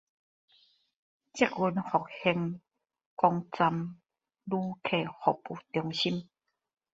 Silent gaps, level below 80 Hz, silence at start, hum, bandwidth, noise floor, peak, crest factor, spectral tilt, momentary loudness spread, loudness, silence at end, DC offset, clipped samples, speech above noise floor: 3.06-3.17 s; -72 dBFS; 1.35 s; none; 8 kHz; -67 dBFS; -8 dBFS; 24 dB; -6 dB/octave; 11 LU; -31 LUFS; 0.7 s; under 0.1%; under 0.1%; 37 dB